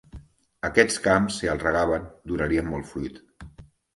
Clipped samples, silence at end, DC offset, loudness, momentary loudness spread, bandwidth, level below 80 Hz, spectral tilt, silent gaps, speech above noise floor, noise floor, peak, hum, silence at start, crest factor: under 0.1%; 0.35 s; under 0.1%; -24 LUFS; 13 LU; 11.5 kHz; -44 dBFS; -4.5 dB/octave; none; 24 dB; -48 dBFS; -2 dBFS; none; 0.15 s; 24 dB